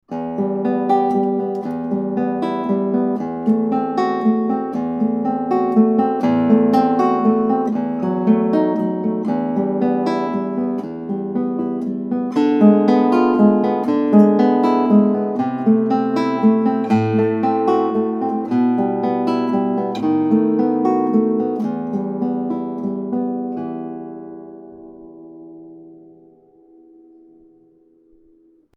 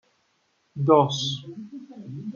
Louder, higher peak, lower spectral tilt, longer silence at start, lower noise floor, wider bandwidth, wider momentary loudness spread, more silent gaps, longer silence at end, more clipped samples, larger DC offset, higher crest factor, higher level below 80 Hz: first, -18 LUFS vs -22 LUFS; first, 0 dBFS vs -4 dBFS; first, -9 dB/octave vs -6 dB/octave; second, 0.1 s vs 0.75 s; second, -54 dBFS vs -69 dBFS; second, 6.6 kHz vs 7.4 kHz; second, 9 LU vs 22 LU; neither; first, 2.8 s vs 0.05 s; neither; neither; about the same, 18 dB vs 22 dB; first, -64 dBFS vs -70 dBFS